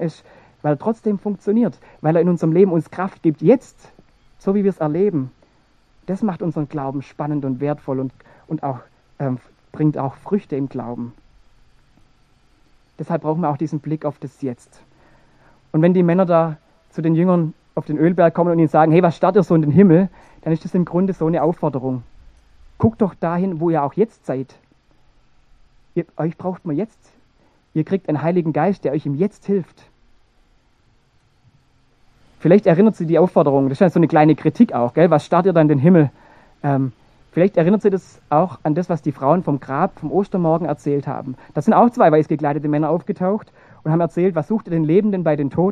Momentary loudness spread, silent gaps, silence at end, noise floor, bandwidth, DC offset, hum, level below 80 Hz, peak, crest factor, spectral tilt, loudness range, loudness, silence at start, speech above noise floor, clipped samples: 13 LU; none; 0 s; -57 dBFS; 9.4 kHz; under 0.1%; none; -54 dBFS; 0 dBFS; 18 dB; -9.5 dB/octave; 11 LU; -18 LUFS; 0 s; 40 dB; under 0.1%